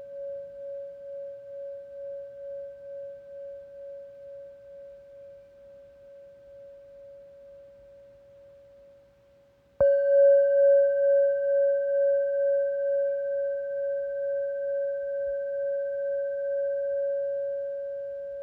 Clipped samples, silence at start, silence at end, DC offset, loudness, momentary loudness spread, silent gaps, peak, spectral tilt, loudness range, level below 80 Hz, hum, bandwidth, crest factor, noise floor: under 0.1%; 0 s; 0 s; under 0.1%; -26 LUFS; 25 LU; none; -12 dBFS; -7 dB/octave; 22 LU; -68 dBFS; none; 1.7 kHz; 16 dB; -60 dBFS